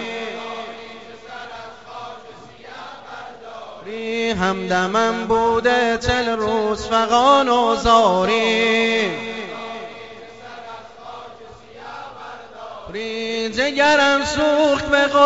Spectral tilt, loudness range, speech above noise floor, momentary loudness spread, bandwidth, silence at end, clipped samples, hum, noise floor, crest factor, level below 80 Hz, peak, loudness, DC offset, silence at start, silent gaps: -4 dB/octave; 18 LU; 24 dB; 22 LU; 8 kHz; 0 s; under 0.1%; none; -41 dBFS; 18 dB; -44 dBFS; -2 dBFS; -18 LUFS; 0.3%; 0 s; none